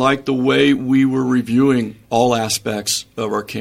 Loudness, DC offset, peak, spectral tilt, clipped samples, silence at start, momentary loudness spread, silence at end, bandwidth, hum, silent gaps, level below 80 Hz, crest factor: -17 LUFS; under 0.1%; 0 dBFS; -4.5 dB/octave; under 0.1%; 0 s; 7 LU; 0 s; 16 kHz; none; none; -54 dBFS; 16 dB